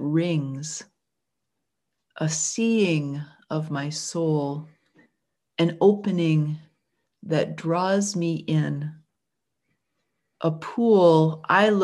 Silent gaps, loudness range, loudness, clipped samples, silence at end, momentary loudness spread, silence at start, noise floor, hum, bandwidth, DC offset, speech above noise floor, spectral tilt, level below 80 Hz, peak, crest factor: none; 4 LU; -23 LUFS; under 0.1%; 0 s; 14 LU; 0 s; -83 dBFS; none; 11.5 kHz; under 0.1%; 60 dB; -5.5 dB/octave; -72 dBFS; -4 dBFS; 20 dB